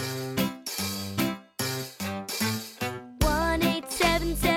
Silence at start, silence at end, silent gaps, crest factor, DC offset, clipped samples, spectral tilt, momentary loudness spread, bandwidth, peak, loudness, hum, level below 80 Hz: 0 s; 0 s; none; 18 dB; under 0.1%; under 0.1%; -4 dB/octave; 9 LU; 19.5 kHz; -10 dBFS; -28 LUFS; none; -38 dBFS